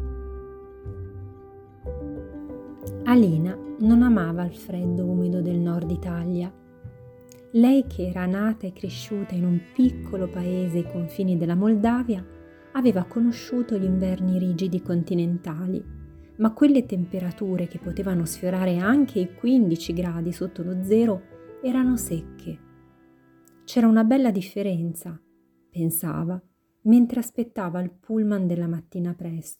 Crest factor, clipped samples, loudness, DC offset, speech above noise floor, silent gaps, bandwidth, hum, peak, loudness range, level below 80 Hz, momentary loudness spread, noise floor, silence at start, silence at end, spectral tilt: 16 dB; under 0.1%; -24 LUFS; under 0.1%; 38 dB; none; 18.5 kHz; none; -8 dBFS; 3 LU; -46 dBFS; 19 LU; -61 dBFS; 0 s; 0.05 s; -7.5 dB/octave